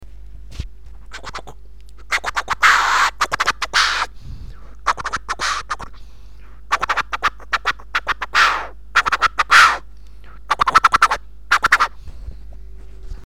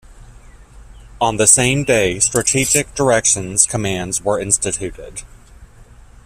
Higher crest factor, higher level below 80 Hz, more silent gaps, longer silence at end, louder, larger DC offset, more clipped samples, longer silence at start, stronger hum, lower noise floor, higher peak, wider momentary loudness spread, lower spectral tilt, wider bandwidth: about the same, 20 dB vs 18 dB; about the same, -38 dBFS vs -40 dBFS; neither; second, 0.05 s vs 0.4 s; about the same, -17 LUFS vs -15 LUFS; first, 2% vs under 0.1%; neither; about the same, 0 s vs 0.1 s; neither; about the same, -41 dBFS vs -42 dBFS; about the same, 0 dBFS vs 0 dBFS; first, 23 LU vs 13 LU; second, -0.5 dB/octave vs -3 dB/octave; about the same, 17.5 kHz vs 16 kHz